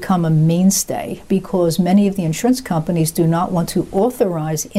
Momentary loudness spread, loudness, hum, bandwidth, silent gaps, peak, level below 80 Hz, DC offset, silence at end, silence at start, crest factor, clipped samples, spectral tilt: 6 LU; -17 LUFS; none; 16 kHz; none; -6 dBFS; -44 dBFS; 0.2%; 0 s; 0 s; 12 dB; under 0.1%; -6 dB/octave